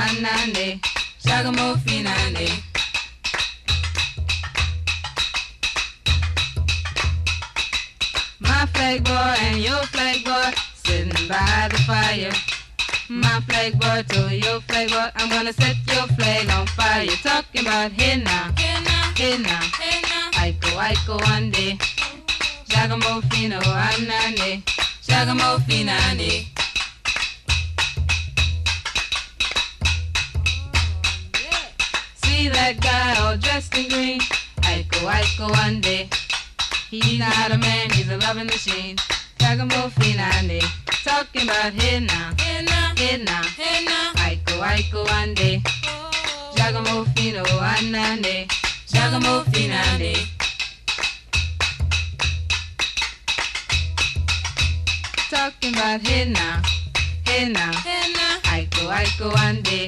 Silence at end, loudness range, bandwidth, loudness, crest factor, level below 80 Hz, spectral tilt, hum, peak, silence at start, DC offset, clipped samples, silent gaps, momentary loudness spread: 0 s; 3 LU; 13 kHz; -20 LUFS; 16 dB; -32 dBFS; -3.5 dB/octave; none; -4 dBFS; 0 s; under 0.1%; under 0.1%; none; 5 LU